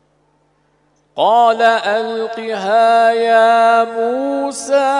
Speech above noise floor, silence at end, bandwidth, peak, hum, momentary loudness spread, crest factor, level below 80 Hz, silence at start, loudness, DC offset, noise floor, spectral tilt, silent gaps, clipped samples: 45 dB; 0 s; 11 kHz; 0 dBFS; 50 Hz at -65 dBFS; 11 LU; 14 dB; -70 dBFS; 1.15 s; -14 LUFS; under 0.1%; -59 dBFS; -3 dB/octave; none; under 0.1%